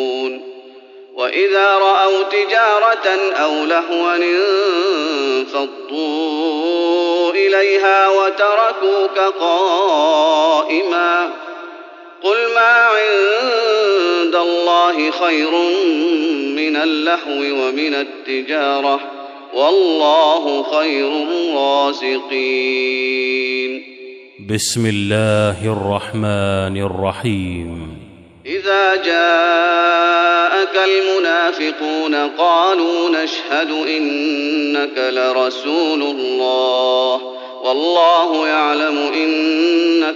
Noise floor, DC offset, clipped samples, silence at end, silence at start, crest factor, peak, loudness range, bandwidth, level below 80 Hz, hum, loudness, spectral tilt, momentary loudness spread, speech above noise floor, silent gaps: -39 dBFS; under 0.1%; under 0.1%; 0 s; 0 s; 14 dB; -2 dBFS; 4 LU; 12 kHz; -60 dBFS; none; -15 LUFS; -4.5 dB/octave; 9 LU; 24 dB; none